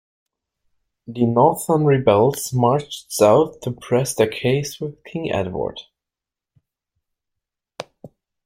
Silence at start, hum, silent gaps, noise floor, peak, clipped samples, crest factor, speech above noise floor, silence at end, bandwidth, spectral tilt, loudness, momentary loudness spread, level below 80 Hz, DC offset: 1.1 s; none; none; -87 dBFS; -2 dBFS; under 0.1%; 20 dB; 69 dB; 0.4 s; 16 kHz; -6 dB/octave; -19 LUFS; 19 LU; -56 dBFS; under 0.1%